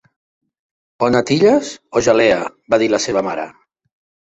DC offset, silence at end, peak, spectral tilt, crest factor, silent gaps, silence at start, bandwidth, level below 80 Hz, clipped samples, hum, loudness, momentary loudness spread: under 0.1%; 0.85 s; -2 dBFS; -4.5 dB/octave; 16 dB; none; 1 s; 8.2 kHz; -52 dBFS; under 0.1%; none; -16 LUFS; 9 LU